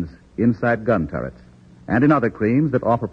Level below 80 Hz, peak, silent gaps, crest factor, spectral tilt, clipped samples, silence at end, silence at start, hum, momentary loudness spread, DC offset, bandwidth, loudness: -46 dBFS; -6 dBFS; none; 14 dB; -10 dB/octave; under 0.1%; 0 s; 0 s; none; 12 LU; under 0.1%; 6 kHz; -20 LUFS